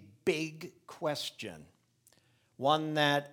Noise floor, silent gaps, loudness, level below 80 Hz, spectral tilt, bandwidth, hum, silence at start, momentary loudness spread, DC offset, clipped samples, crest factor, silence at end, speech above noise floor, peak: -69 dBFS; none; -32 LUFS; -78 dBFS; -4.5 dB/octave; 19 kHz; none; 0 s; 19 LU; under 0.1%; under 0.1%; 22 dB; 0 s; 37 dB; -12 dBFS